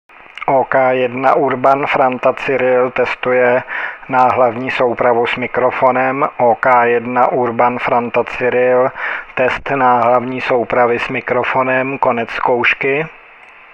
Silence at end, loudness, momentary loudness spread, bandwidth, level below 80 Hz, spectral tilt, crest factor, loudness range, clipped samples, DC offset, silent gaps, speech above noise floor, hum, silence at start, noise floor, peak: 0.55 s; -14 LUFS; 5 LU; 7.6 kHz; -50 dBFS; -7 dB/octave; 14 dB; 1 LU; under 0.1%; under 0.1%; none; 26 dB; none; 0.35 s; -40 dBFS; 0 dBFS